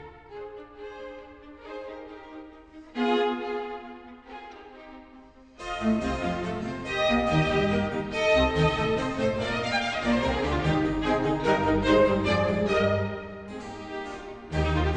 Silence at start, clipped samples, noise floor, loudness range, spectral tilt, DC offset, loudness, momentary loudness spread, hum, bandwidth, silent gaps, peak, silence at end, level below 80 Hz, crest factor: 0 s; under 0.1%; -51 dBFS; 8 LU; -6 dB/octave; under 0.1%; -26 LUFS; 21 LU; none; 9.6 kHz; none; -10 dBFS; 0 s; -40 dBFS; 18 dB